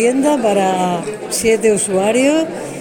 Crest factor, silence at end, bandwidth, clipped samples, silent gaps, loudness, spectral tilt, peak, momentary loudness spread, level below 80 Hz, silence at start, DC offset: 14 dB; 0 s; 18 kHz; under 0.1%; none; -15 LUFS; -4 dB/octave; -2 dBFS; 7 LU; -50 dBFS; 0 s; under 0.1%